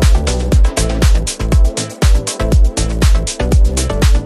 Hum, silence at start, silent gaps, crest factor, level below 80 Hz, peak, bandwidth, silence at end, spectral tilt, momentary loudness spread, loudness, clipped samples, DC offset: none; 0 s; none; 10 dB; -12 dBFS; 0 dBFS; 14 kHz; 0 s; -5 dB/octave; 3 LU; -14 LUFS; under 0.1%; under 0.1%